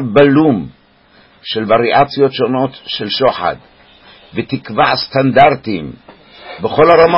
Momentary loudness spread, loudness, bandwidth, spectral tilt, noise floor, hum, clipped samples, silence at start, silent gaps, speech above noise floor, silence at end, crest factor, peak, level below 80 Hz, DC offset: 15 LU; -13 LUFS; 5.8 kHz; -8.5 dB/octave; -48 dBFS; none; under 0.1%; 0 s; none; 36 dB; 0 s; 14 dB; 0 dBFS; -46 dBFS; under 0.1%